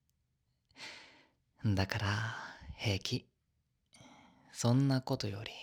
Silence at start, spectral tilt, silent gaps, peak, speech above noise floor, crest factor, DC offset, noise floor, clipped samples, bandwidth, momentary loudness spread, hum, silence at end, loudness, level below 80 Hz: 0.8 s; -5.5 dB/octave; none; -14 dBFS; 46 dB; 24 dB; under 0.1%; -80 dBFS; under 0.1%; 17 kHz; 18 LU; none; 0 s; -35 LUFS; -64 dBFS